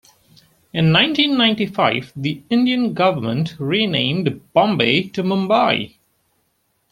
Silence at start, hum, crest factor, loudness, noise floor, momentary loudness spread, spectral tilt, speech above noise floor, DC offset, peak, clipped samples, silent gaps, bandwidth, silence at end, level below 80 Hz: 0.75 s; none; 18 dB; -17 LUFS; -67 dBFS; 8 LU; -6.5 dB/octave; 49 dB; under 0.1%; 0 dBFS; under 0.1%; none; 13.5 kHz; 1.05 s; -56 dBFS